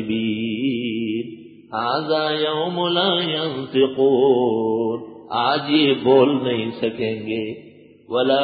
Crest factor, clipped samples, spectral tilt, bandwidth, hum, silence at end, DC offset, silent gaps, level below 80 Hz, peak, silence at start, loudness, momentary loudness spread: 18 dB; under 0.1%; -10.5 dB/octave; 4.9 kHz; none; 0 s; under 0.1%; none; -62 dBFS; -4 dBFS; 0 s; -20 LUFS; 11 LU